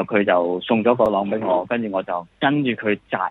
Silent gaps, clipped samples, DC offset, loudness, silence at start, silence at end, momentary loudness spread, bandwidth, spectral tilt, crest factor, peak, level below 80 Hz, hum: none; under 0.1%; under 0.1%; -20 LUFS; 0 s; 0 s; 6 LU; 4.6 kHz; -8.5 dB/octave; 18 dB; -2 dBFS; -58 dBFS; none